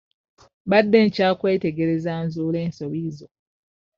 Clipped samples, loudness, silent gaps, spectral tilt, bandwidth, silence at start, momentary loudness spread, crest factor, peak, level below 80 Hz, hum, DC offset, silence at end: under 0.1%; -21 LUFS; none; -5.5 dB/octave; 7.2 kHz; 0.65 s; 14 LU; 20 dB; -2 dBFS; -60 dBFS; none; under 0.1%; 0.7 s